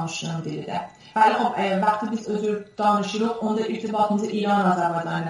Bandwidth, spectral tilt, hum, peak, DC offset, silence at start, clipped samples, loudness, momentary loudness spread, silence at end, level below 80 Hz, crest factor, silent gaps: 11.5 kHz; -5.5 dB/octave; none; -6 dBFS; under 0.1%; 0 s; under 0.1%; -23 LUFS; 10 LU; 0 s; -66 dBFS; 18 dB; none